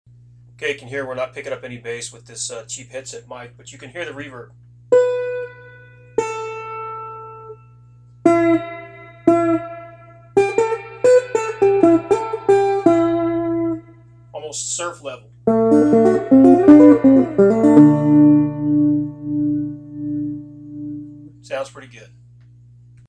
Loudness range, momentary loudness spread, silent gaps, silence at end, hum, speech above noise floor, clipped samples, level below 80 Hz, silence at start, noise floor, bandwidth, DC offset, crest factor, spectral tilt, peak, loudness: 16 LU; 22 LU; none; 1.25 s; 60 Hz at -40 dBFS; 26 dB; under 0.1%; -52 dBFS; 0.6 s; -46 dBFS; 10 kHz; under 0.1%; 18 dB; -6.5 dB/octave; 0 dBFS; -16 LUFS